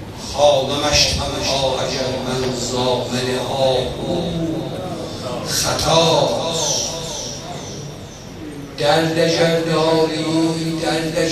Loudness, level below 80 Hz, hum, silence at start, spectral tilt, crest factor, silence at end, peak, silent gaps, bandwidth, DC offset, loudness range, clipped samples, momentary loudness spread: -18 LUFS; -40 dBFS; none; 0 s; -3.5 dB/octave; 18 dB; 0 s; 0 dBFS; none; 14.5 kHz; under 0.1%; 3 LU; under 0.1%; 14 LU